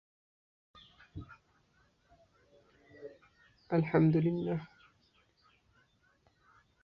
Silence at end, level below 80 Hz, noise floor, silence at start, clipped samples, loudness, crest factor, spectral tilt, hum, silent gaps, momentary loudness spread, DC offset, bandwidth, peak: 2.2 s; -66 dBFS; -71 dBFS; 1.15 s; under 0.1%; -31 LUFS; 22 dB; -10.5 dB/octave; none; none; 25 LU; under 0.1%; 5.4 kHz; -16 dBFS